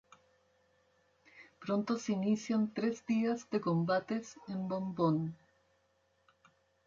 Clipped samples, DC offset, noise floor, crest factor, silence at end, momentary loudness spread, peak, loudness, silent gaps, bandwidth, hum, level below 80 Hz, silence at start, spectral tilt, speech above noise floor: under 0.1%; under 0.1%; -75 dBFS; 18 dB; 1.5 s; 8 LU; -20 dBFS; -35 LUFS; none; 7.6 kHz; none; -76 dBFS; 1.35 s; -7 dB/octave; 41 dB